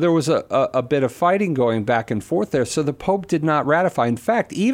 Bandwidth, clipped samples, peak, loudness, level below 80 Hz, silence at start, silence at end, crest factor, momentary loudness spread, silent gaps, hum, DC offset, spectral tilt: 16.5 kHz; under 0.1%; -4 dBFS; -20 LUFS; -54 dBFS; 0 s; 0 s; 14 dB; 4 LU; none; none; under 0.1%; -6 dB/octave